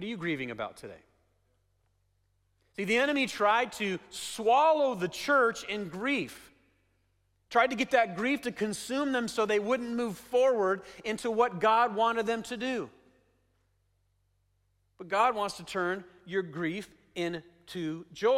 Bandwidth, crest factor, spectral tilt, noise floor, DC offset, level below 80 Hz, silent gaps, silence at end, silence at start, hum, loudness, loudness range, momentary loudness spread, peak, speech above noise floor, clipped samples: 16 kHz; 18 dB; -4 dB/octave; -73 dBFS; under 0.1%; -68 dBFS; none; 0 s; 0 s; none; -29 LUFS; 7 LU; 12 LU; -12 dBFS; 44 dB; under 0.1%